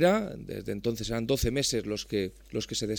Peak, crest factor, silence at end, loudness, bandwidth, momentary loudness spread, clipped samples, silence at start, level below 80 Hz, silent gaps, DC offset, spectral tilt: -12 dBFS; 18 dB; 0 s; -31 LUFS; 19 kHz; 9 LU; under 0.1%; 0 s; -44 dBFS; none; under 0.1%; -4.5 dB/octave